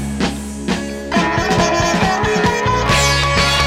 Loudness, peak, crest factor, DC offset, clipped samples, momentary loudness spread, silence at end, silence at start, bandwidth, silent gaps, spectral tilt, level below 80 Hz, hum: -16 LUFS; -2 dBFS; 12 dB; under 0.1%; under 0.1%; 8 LU; 0 s; 0 s; 16.5 kHz; none; -4 dB/octave; -28 dBFS; none